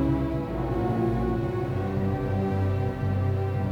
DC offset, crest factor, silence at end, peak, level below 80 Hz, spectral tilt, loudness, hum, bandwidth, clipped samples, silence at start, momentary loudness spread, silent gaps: under 0.1%; 12 dB; 0 s; -14 dBFS; -38 dBFS; -9.5 dB/octave; -27 LUFS; none; 6.4 kHz; under 0.1%; 0 s; 3 LU; none